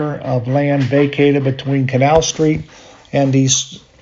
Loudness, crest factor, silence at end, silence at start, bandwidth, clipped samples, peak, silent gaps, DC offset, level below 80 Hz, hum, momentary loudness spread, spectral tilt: -15 LUFS; 16 dB; 0.25 s; 0 s; 7.8 kHz; under 0.1%; 0 dBFS; none; under 0.1%; -42 dBFS; none; 7 LU; -5 dB/octave